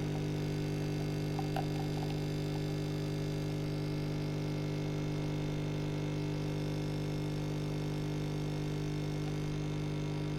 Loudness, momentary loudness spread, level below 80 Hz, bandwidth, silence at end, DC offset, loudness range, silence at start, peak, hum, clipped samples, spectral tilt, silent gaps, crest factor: -36 LUFS; 1 LU; -50 dBFS; 13.5 kHz; 0 s; under 0.1%; 1 LU; 0 s; -22 dBFS; 50 Hz at -35 dBFS; under 0.1%; -7 dB/octave; none; 12 dB